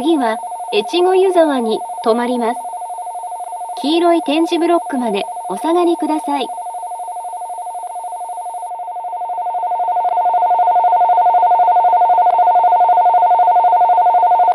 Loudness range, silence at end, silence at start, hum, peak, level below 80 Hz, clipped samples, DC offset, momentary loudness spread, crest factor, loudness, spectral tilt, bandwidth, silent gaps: 11 LU; 0 s; 0 s; none; 0 dBFS; -82 dBFS; under 0.1%; under 0.1%; 14 LU; 14 dB; -14 LUFS; -4 dB/octave; 12 kHz; none